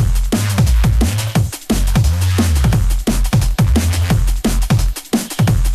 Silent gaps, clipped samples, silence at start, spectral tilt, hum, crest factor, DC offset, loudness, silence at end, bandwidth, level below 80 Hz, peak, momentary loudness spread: none; under 0.1%; 0 s; -5.5 dB/octave; none; 12 dB; under 0.1%; -16 LUFS; 0 s; 14 kHz; -16 dBFS; -2 dBFS; 4 LU